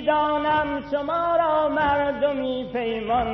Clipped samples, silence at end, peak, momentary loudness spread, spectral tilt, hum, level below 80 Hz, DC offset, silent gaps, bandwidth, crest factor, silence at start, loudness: under 0.1%; 0 s; -10 dBFS; 6 LU; -7.5 dB/octave; 50 Hz at -50 dBFS; -46 dBFS; under 0.1%; none; 6 kHz; 12 dB; 0 s; -23 LUFS